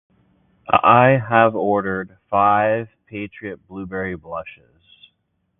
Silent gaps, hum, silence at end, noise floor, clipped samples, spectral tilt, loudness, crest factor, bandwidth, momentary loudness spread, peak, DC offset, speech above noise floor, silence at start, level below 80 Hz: none; none; 1.1 s; -70 dBFS; under 0.1%; -11 dB/octave; -17 LUFS; 20 dB; 3.9 kHz; 19 LU; 0 dBFS; under 0.1%; 51 dB; 0.7 s; -52 dBFS